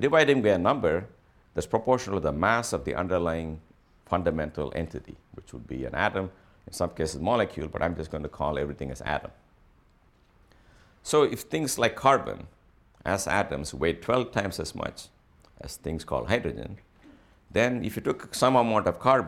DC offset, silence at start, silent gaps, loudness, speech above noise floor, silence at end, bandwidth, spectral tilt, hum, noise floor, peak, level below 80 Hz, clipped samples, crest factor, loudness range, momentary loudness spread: under 0.1%; 0 s; none; -27 LUFS; 34 dB; 0 s; 16.5 kHz; -5 dB/octave; none; -61 dBFS; -6 dBFS; -48 dBFS; under 0.1%; 22 dB; 5 LU; 16 LU